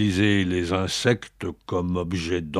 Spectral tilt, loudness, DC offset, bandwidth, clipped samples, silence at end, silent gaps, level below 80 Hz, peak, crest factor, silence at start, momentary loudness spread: -5.5 dB/octave; -24 LUFS; under 0.1%; 14 kHz; under 0.1%; 0 s; none; -46 dBFS; -4 dBFS; 20 dB; 0 s; 8 LU